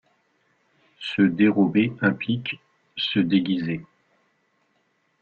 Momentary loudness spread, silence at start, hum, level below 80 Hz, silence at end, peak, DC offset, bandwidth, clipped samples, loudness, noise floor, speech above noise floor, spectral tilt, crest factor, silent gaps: 15 LU; 1 s; none; -62 dBFS; 1.35 s; -6 dBFS; under 0.1%; 6.6 kHz; under 0.1%; -23 LUFS; -69 dBFS; 47 dB; -8 dB/octave; 18 dB; none